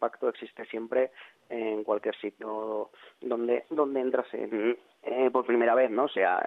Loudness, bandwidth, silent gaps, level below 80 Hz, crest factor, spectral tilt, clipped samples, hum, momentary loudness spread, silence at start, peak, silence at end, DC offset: -29 LUFS; 4.1 kHz; none; -80 dBFS; 18 dB; -7 dB/octave; under 0.1%; none; 13 LU; 0 s; -12 dBFS; 0 s; under 0.1%